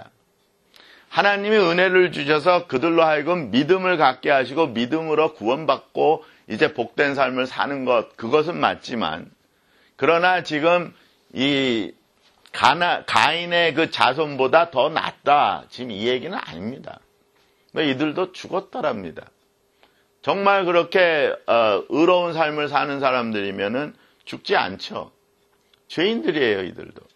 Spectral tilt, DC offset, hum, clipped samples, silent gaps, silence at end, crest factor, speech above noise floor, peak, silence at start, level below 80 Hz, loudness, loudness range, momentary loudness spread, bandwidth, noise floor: -5 dB/octave; under 0.1%; none; under 0.1%; none; 0.15 s; 22 dB; 43 dB; 0 dBFS; 0 s; -64 dBFS; -20 LUFS; 7 LU; 14 LU; 12 kHz; -64 dBFS